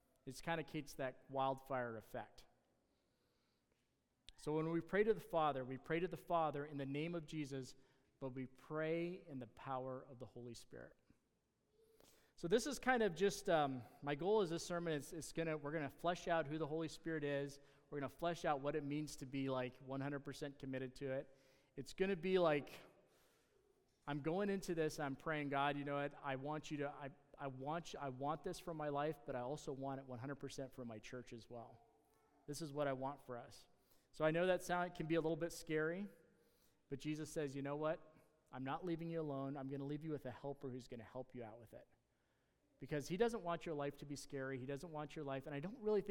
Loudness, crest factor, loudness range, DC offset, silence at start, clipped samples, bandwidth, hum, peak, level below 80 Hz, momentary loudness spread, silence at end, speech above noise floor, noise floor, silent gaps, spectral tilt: -44 LUFS; 24 dB; 8 LU; under 0.1%; 0.25 s; under 0.1%; 17.5 kHz; none; -22 dBFS; -70 dBFS; 15 LU; 0 s; 41 dB; -84 dBFS; none; -5.5 dB/octave